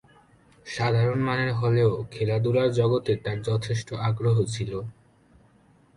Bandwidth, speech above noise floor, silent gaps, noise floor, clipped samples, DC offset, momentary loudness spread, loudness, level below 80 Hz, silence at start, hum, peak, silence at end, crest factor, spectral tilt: 11 kHz; 35 dB; none; -59 dBFS; under 0.1%; under 0.1%; 9 LU; -25 LUFS; -54 dBFS; 0.65 s; none; -10 dBFS; 1.05 s; 16 dB; -7 dB/octave